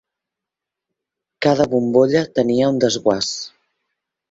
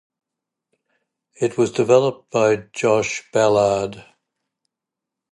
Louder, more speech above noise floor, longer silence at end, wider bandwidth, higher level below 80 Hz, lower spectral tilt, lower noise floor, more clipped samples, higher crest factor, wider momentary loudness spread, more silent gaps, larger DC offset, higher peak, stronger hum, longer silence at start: about the same, -17 LUFS vs -19 LUFS; about the same, 68 dB vs 67 dB; second, 0.85 s vs 1.3 s; second, 8 kHz vs 11.5 kHz; about the same, -58 dBFS vs -58 dBFS; about the same, -5 dB/octave vs -5 dB/octave; about the same, -85 dBFS vs -85 dBFS; neither; about the same, 18 dB vs 20 dB; about the same, 7 LU vs 8 LU; neither; neither; about the same, -2 dBFS vs -2 dBFS; neither; about the same, 1.4 s vs 1.4 s